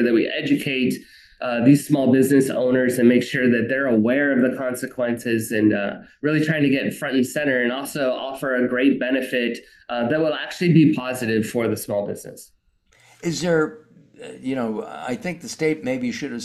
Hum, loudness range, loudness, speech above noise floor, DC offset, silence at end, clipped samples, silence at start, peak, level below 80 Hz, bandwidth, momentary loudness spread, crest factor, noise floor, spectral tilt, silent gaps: none; 8 LU; -21 LUFS; 39 dB; under 0.1%; 0 s; under 0.1%; 0 s; -2 dBFS; -62 dBFS; 12.5 kHz; 12 LU; 18 dB; -59 dBFS; -6 dB/octave; none